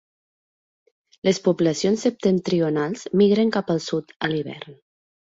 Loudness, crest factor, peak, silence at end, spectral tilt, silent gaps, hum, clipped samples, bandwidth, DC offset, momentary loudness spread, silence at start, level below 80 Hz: -22 LUFS; 16 dB; -6 dBFS; 0.65 s; -6 dB/octave; 4.16-4.20 s; none; under 0.1%; 8 kHz; under 0.1%; 10 LU; 1.25 s; -62 dBFS